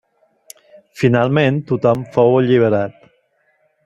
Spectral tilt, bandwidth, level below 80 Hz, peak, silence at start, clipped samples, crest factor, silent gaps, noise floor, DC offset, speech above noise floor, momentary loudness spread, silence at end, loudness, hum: -8 dB/octave; 12.5 kHz; -56 dBFS; -2 dBFS; 0.95 s; under 0.1%; 16 dB; none; -61 dBFS; under 0.1%; 47 dB; 5 LU; 0.95 s; -15 LUFS; none